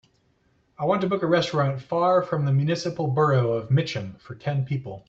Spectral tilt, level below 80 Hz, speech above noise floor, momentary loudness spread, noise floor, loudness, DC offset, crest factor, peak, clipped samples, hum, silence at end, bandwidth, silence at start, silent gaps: -7 dB/octave; -62 dBFS; 42 dB; 9 LU; -65 dBFS; -24 LUFS; under 0.1%; 16 dB; -8 dBFS; under 0.1%; none; 0.1 s; 7.8 kHz; 0.8 s; none